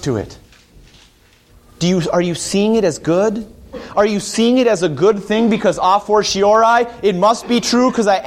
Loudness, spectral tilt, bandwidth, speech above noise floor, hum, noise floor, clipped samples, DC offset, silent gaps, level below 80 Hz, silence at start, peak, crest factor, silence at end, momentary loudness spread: -15 LUFS; -5 dB/octave; 15 kHz; 35 dB; none; -50 dBFS; under 0.1%; under 0.1%; none; -46 dBFS; 0 s; -2 dBFS; 14 dB; 0 s; 8 LU